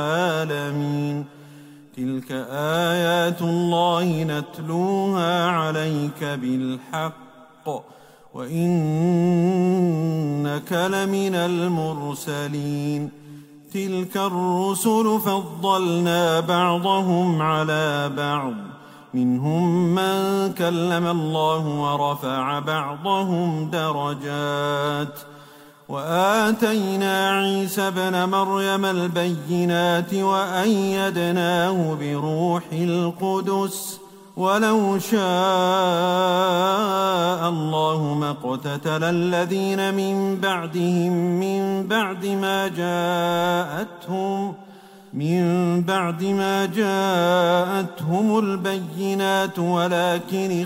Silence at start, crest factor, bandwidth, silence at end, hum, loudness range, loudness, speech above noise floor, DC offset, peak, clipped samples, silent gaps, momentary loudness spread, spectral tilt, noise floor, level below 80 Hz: 0 s; 16 dB; 16 kHz; 0 s; none; 4 LU; -22 LUFS; 25 dB; under 0.1%; -6 dBFS; under 0.1%; none; 8 LU; -5.5 dB/octave; -47 dBFS; -68 dBFS